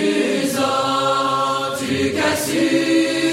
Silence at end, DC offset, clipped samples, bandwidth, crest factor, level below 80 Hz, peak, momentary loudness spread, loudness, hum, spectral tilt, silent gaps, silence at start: 0 s; under 0.1%; under 0.1%; 16.5 kHz; 14 dB; -58 dBFS; -6 dBFS; 4 LU; -18 LUFS; none; -3.5 dB/octave; none; 0 s